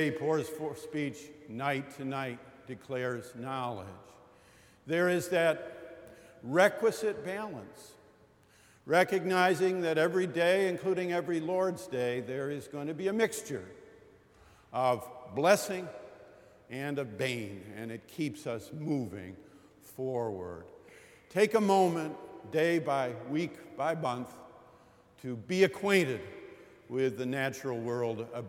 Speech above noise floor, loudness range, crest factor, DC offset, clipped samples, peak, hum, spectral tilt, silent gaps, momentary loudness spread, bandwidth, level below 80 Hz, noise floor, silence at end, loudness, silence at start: 31 dB; 8 LU; 22 dB; under 0.1%; under 0.1%; -10 dBFS; none; -5 dB/octave; none; 19 LU; 17 kHz; -72 dBFS; -62 dBFS; 0 s; -32 LUFS; 0 s